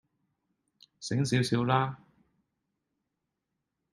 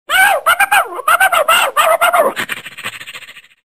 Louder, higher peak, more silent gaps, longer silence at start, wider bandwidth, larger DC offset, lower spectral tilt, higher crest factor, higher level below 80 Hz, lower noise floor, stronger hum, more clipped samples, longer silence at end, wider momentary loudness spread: second, -29 LUFS vs -11 LUFS; second, -10 dBFS vs 0 dBFS; neither; first, 1 s vs 0.1 s; second, 12 kHz vs 16.5 kHz; second, under 0.1% vs 0.4%; first, -5.5 dB/octave vs 0 dB/octave; first, 24 dB vs 14 dB; second, -66 dBFS vs -54 dBFS; first, -85 dBFS vs -35 dBFS; neither; neither; first, 1.95 s vs 0.3 s; about the same, 15 LU vs 15 LU